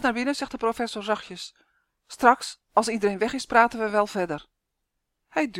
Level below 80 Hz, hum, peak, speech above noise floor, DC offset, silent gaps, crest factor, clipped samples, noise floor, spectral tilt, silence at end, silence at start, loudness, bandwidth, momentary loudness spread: -58 dBFS; none; -2 dBFS; 55 dB; under 0.1%; none; 24 dB; under 0.1%; -80 dBFS; -4 dB/octave; 0 s; 0 s; -25 LUFS; 16.5 kHz; 15 LU